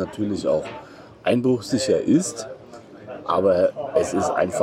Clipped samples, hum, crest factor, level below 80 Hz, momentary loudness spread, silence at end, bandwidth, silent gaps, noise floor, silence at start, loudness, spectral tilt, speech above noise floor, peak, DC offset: under 0.1%; none; 16 dB; -58 dBFS; 18 LU; 0 s; 14 kHz; none; -42 dBFS; 0 s; -22 LUFS; -5.5 dB/octave; 21 dB; -6 dBFS; under 0.1%